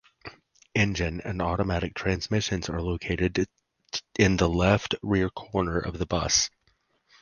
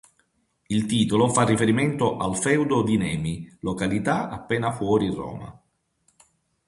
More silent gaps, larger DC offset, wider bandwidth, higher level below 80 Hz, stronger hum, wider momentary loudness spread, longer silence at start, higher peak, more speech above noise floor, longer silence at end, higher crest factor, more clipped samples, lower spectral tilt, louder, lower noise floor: neither; neither; about the same, 10.5 kHz vs 11.5 kHz; first, -40 dBFS vs -50 dBFS; neither; about the same, 9 LU vs 11 LU; second, 0.25 s vs 0.7 s; about the same, -6 dBFS vs -6 dBFS; about the same, 43 dB vs 46 dB; second, 0.75 s vs 1.15 s; about the same, 22 dB vs 20 dB; neither; about the same, -4.5 dB/octave vs -5.5 dB/octave; second, -27 LUFS vs -23 LUFS; about the same, -69 dBFS vs -69 dBFS